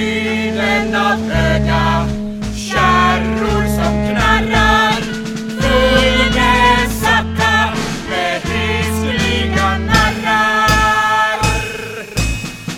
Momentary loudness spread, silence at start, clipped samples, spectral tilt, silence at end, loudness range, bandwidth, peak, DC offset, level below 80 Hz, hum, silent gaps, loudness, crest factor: 9 LU; 0 s; under 0.1%; -4.5 dB/octave; 0 s; 2 LU; 17 kHz; 0 dBFS; under 0.1%; -24 dBFS; none; none; -14 LUFS; 14 dB